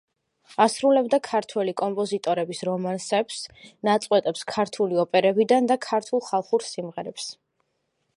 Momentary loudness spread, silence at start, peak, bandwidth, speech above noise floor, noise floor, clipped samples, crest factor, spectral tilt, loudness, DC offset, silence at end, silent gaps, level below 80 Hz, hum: 12 LU; 0.5 s; -4 dBFS; 11.5 kHz; 51 dB; -74 dBFS; under 0.1%; 20 dB; -4.5 dB/octave; -24 LUFS; under 0.1%; 0.85 s; none; -72 dBFS; none